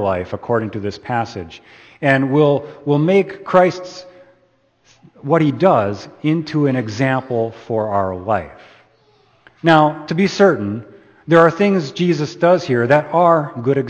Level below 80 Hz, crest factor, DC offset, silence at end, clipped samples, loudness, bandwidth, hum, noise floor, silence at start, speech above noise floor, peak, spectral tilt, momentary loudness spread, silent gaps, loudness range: -56 dBFS; 16 dB; under 0.1%; 0 s; under 0.1%; -16 LUFS; 8.6 kHz; none; -58 dBFS; 0 s; 42 dB; 0 dBFS; -7 dB/octave; 11 LU; none; 4 LU